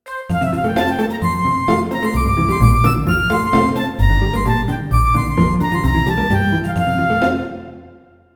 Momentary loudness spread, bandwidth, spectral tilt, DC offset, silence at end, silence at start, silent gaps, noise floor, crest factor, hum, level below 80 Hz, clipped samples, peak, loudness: 4 LU; over 20 kHz; -7 dB/octave; under 0.1%; 0.45 s; 0.05 s; none; -45 dBFS; 16 dB; none; -24 dBFS; under 0.1%; 0 dBFS; -17 LUFS